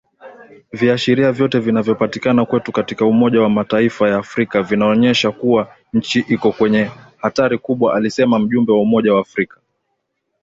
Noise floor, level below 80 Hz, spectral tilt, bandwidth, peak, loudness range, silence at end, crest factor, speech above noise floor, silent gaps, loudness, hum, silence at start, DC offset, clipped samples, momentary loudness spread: -71 dBFS; -54 dBFS; -6.5 dB/octave; 7.8 kHz; -2 dBFS; 1 LU; 1 s; 14 dB; 56 dB; none; -16 LUFS; none; 0.25 s; under 0.1%; under 0.1%; 7 LU